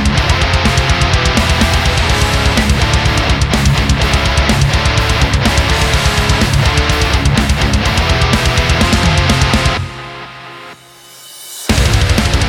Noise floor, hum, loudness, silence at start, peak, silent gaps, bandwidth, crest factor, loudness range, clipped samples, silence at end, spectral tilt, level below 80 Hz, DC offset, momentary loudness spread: -38 dBFS; none; -12 LUFS; 0 s; 0 dBFS; none; 17 kHz; 12 dB; 3 LU; under 0.1%; 0 s; -4.5 dB/octave; -16 dBFS; under 0.1%; 9 LU